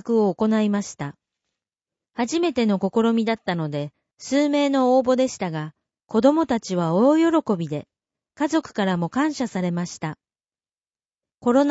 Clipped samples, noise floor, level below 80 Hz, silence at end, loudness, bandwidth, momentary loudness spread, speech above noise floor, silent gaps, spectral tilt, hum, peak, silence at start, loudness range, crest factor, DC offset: under 0.1%; under -90 dBFS; -62 dBFS; 0 s; -22 LUFS; 8 kHz; 14 LU; over 69 dB; none; -6 dB/octave; none; -4 dBFS; 0.05 s; 6 LU; 18 dB; under 0.1%